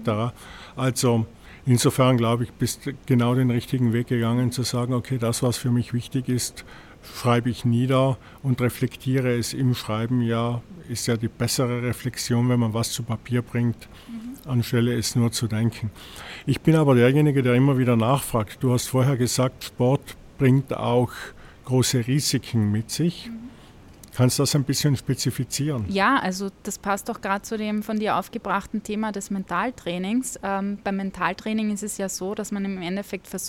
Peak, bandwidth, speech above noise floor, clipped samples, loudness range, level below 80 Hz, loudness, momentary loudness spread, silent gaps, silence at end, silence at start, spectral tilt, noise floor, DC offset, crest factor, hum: -6 dBFS; 17 kHz; 24 dB; under 0.1%; 6 LU; -50 dBFS; -24 LUFS; 11 LU; none; 0 s; 0 s; -5.5 dB/octave; -47 dBFS; under 0.1%; 18 dB; none